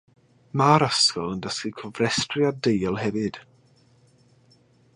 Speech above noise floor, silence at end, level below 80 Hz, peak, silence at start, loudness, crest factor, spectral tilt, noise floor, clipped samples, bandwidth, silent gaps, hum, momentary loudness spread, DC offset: 36 dB; 1.55 s; -58 dBFS; -4 dBFS; 0.55 s; -23 LUFS; 22 dB; -4 dB/octave; -59 dBFS; under 0.1%; 11.5 kHz; none; none; 13 LU; under 0.1%